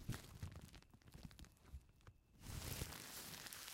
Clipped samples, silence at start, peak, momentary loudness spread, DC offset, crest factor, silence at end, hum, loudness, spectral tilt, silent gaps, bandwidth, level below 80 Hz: under 0.1%; 0 s; -30 dBFS; 16 LU; under 0.1%; 24 dB; 0 s; none; -54 LUFS; -3.5 dB/octave; none; 16.5 kHz; -62 dBFS